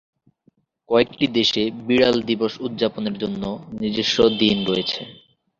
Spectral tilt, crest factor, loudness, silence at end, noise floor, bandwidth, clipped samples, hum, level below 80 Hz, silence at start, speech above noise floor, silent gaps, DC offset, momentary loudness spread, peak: -5 dB/octave; 20 dB; -21 LUFS; 0.45 s; -62 dBFS; 7.6 kHz; under 0.1%; none; -52 dBFS; 0.9 s; 42 dB; none; under 0.1%; 10 LU; -2 dBFS